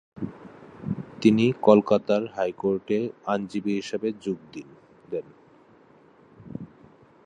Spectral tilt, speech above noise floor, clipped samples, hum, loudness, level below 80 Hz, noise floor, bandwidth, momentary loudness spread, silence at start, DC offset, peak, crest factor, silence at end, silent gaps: -7 dB/octave; 32 dB; under 0.1%; none; -25 LUFS; -64 dBFS; -55 dBFS; 9.2 kHz; 22 LU; 0.15 s; under 0.1%; -2 dBFS; 24 dB; 0.6 s; none